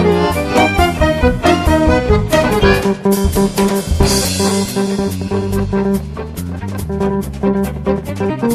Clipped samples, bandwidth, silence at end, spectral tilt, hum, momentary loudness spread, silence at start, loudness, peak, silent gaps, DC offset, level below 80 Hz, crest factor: under 0.1%; 14.5 kHz; 0 s; -5.5 dB/octave; none; 7 LU; 0 s; -15 LUFS; 0 dBFS; none; under 0.1%; -24 dBFS; 14 dB